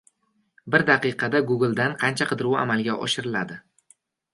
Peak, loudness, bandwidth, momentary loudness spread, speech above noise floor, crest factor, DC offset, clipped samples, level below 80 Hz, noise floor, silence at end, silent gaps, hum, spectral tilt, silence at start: -2 dBFS; -23 LUFS; 11.5 kHz; 8 LU; 46 dB; 22 dB; under 0.1%; under 0.1%; -66 dBFS; -69 dBFS; 0.75 s; none; none; -5 dB/octave; 0.65 s